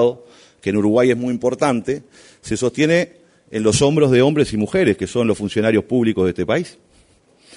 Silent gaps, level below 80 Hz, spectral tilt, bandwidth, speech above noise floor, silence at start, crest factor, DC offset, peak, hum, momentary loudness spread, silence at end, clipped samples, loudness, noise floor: none; -48 dBFS; -5.5 dB/octave; 11 kHz; 37 dB; 0 s; 16 dB; under 0.1%; -4 dBFS; none; 13 LU; 0.85 s; under 0.1%; -18 LUFS; -54 dBFS